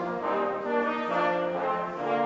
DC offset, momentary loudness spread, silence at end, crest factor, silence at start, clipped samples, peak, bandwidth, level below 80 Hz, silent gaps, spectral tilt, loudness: under 0.1%; 3 LU; 0 s; 14 dB; 0 s; under 0.1%; -14 dBFS; 7.8 kHz; -70 dBFS; none; -6.5 dB/octave; -28 LUFS